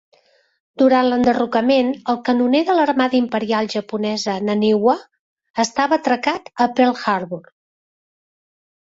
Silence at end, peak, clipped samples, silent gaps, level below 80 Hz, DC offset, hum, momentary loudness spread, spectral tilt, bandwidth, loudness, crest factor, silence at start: 1.45 s; -2 dBFS; under 0.1%; 5.19-5.37 s, 5.50-5.54 s; -60 dBFS; under 0.1%; none; 7 LU; -5 dB/octave; 7.8 kHz; -18 LUFS; 16 dB; 0.8 s